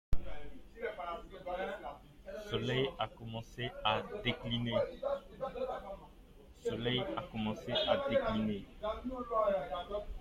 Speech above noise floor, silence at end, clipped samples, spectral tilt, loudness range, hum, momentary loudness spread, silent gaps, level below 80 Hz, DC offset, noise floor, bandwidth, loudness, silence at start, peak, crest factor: 21 dB; 0 s; under 0.1%; -6 dB/octave; 5 LU; none; 13 LU; none; -50 dBFS; under 0.1%; -57 dBFS; 14.5 kHz; -37 LUFS; 0.1 s; -18 dBFS; 20 dB